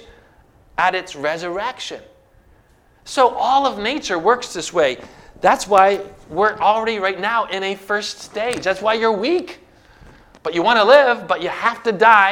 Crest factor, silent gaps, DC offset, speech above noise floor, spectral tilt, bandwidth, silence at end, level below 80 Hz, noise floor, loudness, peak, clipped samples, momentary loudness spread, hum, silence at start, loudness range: 18 dB; none; under 0.1%; 36 dB; -3 dB/octave; 16.5 kHz; 0 s; -52 dBFS; -53 dBFS; -18 LUFS; 0 dBFS; under 0.1%; 13 LU; none; 0.8 s; 4 LU